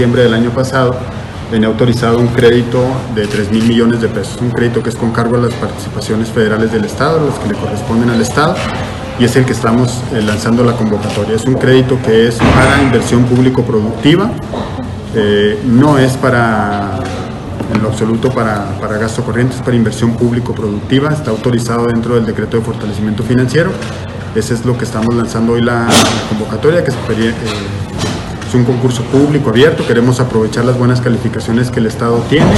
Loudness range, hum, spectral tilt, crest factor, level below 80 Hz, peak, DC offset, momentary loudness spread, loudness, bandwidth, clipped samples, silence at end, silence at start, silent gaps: 4 LU; none; -6 dB/octave; 12 dB; -32 dBFS; 0 dBFS; under 0.1%; 9 LU; -12 LUFS; 13 kHz; 0.2%; 0 s; 0 s; none